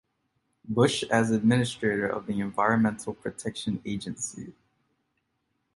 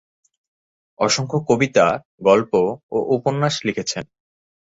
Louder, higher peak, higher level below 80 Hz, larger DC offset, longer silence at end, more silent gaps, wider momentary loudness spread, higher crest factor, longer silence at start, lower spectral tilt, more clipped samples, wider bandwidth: second, -27 LUFS vs -19 LUFS; second, -8 dBFS vs -2 dBFS; about the same, -60 dBFS vs -58 dBFS; neither; first, 1.25 s vs 0.7 s; second, none vs 2.05-2.18 s, 2.83-2.89 s; first, 12 LU vs 8 LU; about the same, 20 dB vs 18 dB; second, 0.65 s vs 1 s; about the same, -5 dB/octave vs -4.5 dB/octave; neither; first, 11.5 kHz vs 8 kHz